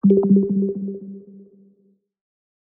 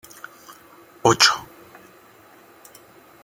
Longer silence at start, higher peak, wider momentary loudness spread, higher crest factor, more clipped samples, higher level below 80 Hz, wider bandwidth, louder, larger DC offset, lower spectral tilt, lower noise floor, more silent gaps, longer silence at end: second, 0.05 s vs 1.05 s; second, -6 dBFS vs 0 dBFS; second, 23 LU vs 26 LU; second, 16 dB vs 24 dB; neither; about the same, -64 dBFS vs -60 dBFS; second, 1.4 kHz vs 17 kHz; about the same, -19 LUFS vs -18 LUFS; neither; first, -15.5 dB/octave vs -2 dB/octave; first, -61 dBFS vs -50 dBFS; neither; second, 1.3 s vs 1.8 s